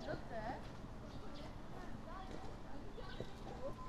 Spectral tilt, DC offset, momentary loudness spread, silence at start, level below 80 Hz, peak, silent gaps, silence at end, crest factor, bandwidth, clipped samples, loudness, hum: -6 dB/octave; under 0.1%; 6 LU; 0 s; -54 dBFS; -32 dBFS; none; 0 s; 14 dB; 13 kHz; under 0.1%; -51 LUFS; none